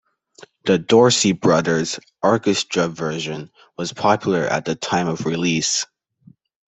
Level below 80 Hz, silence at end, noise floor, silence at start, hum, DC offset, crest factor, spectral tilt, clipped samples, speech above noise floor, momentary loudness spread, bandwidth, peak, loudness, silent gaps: -58 dBFS; 0.85 s; -52 dBFS; 0.65 s; none; under 0.1%; 18 dB; -4 dB/octave; under 0.1%; 33 dB; 13 LU; 8.4 kHz; -2 dBFS; -19 LUFS; none